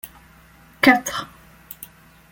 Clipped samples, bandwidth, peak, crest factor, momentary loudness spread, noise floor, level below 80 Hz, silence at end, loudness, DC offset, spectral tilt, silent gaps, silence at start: under 0.1%; 17 kHz; -2 dBFS; 22 dB; 25 LU; -50 dBFS; -56 dBFS; 0.45 s; -18 LUFS; under 0.1%; -3 dB/octave; none; 0.05 s